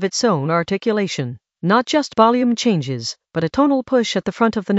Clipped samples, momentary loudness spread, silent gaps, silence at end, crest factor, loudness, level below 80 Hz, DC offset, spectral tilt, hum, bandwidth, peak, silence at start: under 0.1%; 10 LU; none; 0 s; 18 dB; -18 LUFS; -56 dBFS; under 0.1%; -5 dB/octave; none; 8.2 kHz; 0 dBFS; 0 s